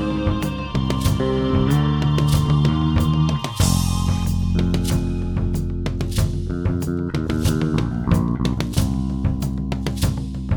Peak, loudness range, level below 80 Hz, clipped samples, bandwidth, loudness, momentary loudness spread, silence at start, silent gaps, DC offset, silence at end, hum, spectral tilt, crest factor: -4 dBFS; 4 LU; -28 dBFS; under 0.1%; over 20 kHz; -21 LUFS; 6 LU; 0 s; none; under 0.1%; 0 s; none; -6.5 dB/octave; 16 dB